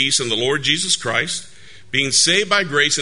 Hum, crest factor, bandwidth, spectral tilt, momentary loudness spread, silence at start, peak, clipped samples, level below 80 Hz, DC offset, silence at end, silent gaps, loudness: none; 18 dB; 11 kHz; -1.5 dB/octave; 8 LU; 0 s; 0 dBFS; under 0.1%; -56 dBFS; 1%; 0 s; none; -16 LUFS